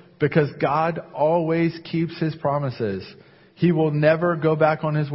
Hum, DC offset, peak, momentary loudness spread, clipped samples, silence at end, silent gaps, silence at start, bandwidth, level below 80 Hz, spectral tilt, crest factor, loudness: none; under 0.1%; -4 dBFS; 7 LU; under 0.1%; 0 s; none; 0.2 s; 5.8 kHz; -58 dBFS; -12 dB/octave; 18 dB; -22 LUFS